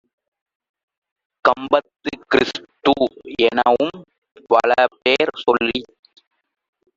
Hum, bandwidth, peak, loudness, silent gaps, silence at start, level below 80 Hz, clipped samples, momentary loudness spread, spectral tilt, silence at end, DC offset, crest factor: none; 7.8 kHz; -2 dBFS; -18 LUFS; 4.18-4.22 s; 1.45 s; -56 dBFS; under 0.1%; 8 LU; -4.5 dB/octave; 1.1 s; under 0.1%; 20 dB